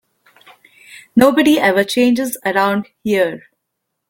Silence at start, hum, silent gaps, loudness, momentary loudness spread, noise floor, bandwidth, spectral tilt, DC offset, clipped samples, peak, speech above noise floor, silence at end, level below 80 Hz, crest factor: 0.9 s; none; none; -15 LUFS; 8 LU; -75 dBFS; 17 kHz; -4.5 dB/octave; under 0.1%; under 0.1%; 0 dBFS; 61 dB; 0.7 s; -56 dBFS; 16 dB